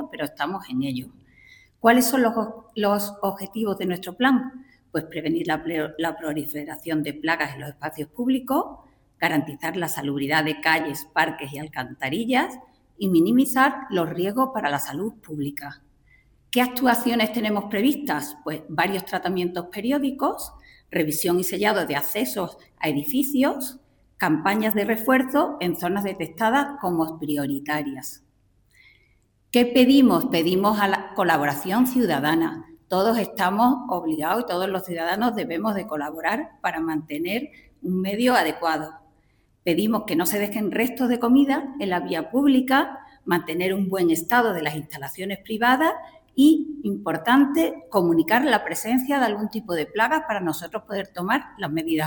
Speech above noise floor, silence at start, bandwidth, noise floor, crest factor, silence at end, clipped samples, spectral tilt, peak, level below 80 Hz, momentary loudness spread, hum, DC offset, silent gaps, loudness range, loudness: 40 dB; 0 s; 19.5 kHz; -63 dBFS; 22 dB; 0 s; under 0.1%; -4.5 dB/octave; -2 dBFS; -60 dBFS; 12 LU; none; under 0.1%; none; 5 LU; -23 LUFS